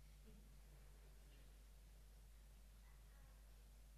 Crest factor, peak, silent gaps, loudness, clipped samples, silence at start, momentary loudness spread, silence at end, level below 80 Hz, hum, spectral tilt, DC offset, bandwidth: 10 dB; -54 dBFS; none; -67 LUFS; under 0.1%; 0 s; 1 LU; 0 s; -64 dBFS; none; -4.5 dB/octave; under 0.1%; 14.5 kHz